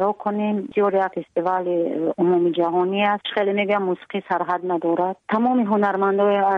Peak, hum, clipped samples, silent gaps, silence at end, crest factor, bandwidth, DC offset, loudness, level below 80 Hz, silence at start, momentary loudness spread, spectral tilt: -8 dBFS; none; under 0.1%; none; 0 s; 12 dB; 5 kHz; under 0.1%; -21 LUFS; -70 dBFS; 0 s; 5 LU; -8.5 dB/octave